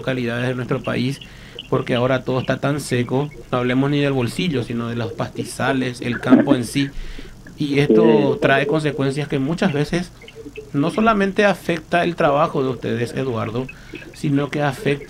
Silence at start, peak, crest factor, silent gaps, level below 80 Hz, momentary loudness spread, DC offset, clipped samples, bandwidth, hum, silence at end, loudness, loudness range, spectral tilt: 0 s; 0 dBFS; 20 dB; none; -44 dBFS; 11 LU; under 0.1%; under 0.1%; 15.5 kHz; none; 0 s; -20 LUFS; 4 LU; -6.5 dB/octave